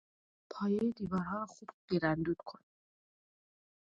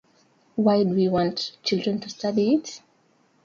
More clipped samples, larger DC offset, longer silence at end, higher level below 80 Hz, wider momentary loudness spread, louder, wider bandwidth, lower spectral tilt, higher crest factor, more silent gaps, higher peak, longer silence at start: neither; neither; first, 1.3 s vs 0.65 s; about the same, -66 dBFS vs -62 dBFS; first, 16 LU vs 11 LU; second, -36 LUFS vs -24 LUFS; about the same, 7.8 kHz vs 7.4 kHz; first, -7.5 dB/octave vs -6 dB/octave; about the same, 20 dB vs 16 dB; first, 1.74-1.88 s vs none; second, -18 dBFS vs -8 dBFS; about the same, 0.5 s vs 0.55 s